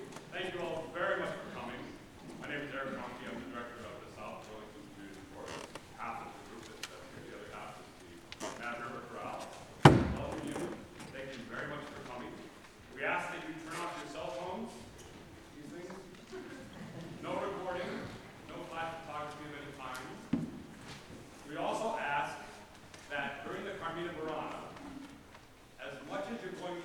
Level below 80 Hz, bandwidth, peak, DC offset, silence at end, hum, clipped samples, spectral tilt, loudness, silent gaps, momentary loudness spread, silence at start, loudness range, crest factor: -58 dBFS; 19 kHz; -2 dBFS; under 0.1%; 0 s; none; under 0.1%; -5.5 dB/octave; -39 LUFS; none; 15 LU; 0 s; 13 LU; 36 dB